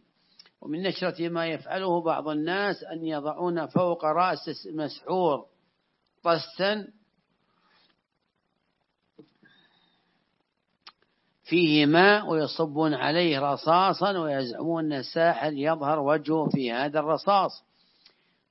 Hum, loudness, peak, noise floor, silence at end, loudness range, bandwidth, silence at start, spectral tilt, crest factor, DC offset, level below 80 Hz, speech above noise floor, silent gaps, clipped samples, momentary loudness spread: none; -26 LUFS; -4 dBFS; -77 dBFS; 0.9 s; 10 LU; 6 kHz; 0.65 s; -9 dB/octave; 22 dB; under 0.1%; -82 dBFS; 52 dB; none; under 0.1%; 10 LU